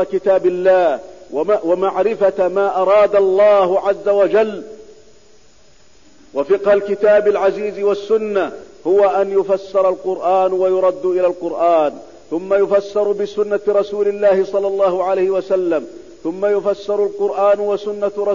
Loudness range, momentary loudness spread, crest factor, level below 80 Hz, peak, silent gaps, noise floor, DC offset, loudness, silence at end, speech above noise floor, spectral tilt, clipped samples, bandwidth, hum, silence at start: 4 LU; 9 LU; 12 dB; -56 dBFS; -4 dBFS; none; -51 dBFS; 0.5%; -16 LUFS; 0 s; 36 dB; -6.5 dB/octave; under 0.1%; 7.4 kHz; none; 0 s